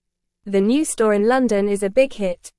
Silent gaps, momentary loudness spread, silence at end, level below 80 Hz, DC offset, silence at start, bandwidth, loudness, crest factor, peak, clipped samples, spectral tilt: none; 4 LU; 0.1 s; -50 dBFS; under 0.1%; 0.45 s; 12 kHz; -19 LUFS; 16 dB; -4 dBFS; under 0.1%; -5 dB/octave